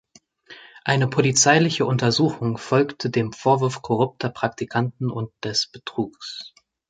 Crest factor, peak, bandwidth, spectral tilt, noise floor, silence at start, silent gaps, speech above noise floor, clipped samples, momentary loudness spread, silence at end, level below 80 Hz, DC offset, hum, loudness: 20 dB; -2 dBFS; 9.6 kHz; -4.5 dB/octave; -49 dBFS; 0.5 s; none; 28 dB; under 0.1%; 13 LU; 0.4 s; -60 dBFS; under 0.1%; none; -22 LUFS